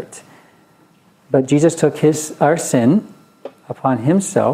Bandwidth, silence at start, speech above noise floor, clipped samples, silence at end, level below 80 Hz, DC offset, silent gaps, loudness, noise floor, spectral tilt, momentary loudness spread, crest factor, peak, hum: 16 kHz; 0 s; 37 dB; under 0.1%; 0 s; -62 dBFS; under 0.1%; none; -16 LUFS; -52 dBFS; -6 dB/octave; 18 LU; 18 dB; 0 dBFS; none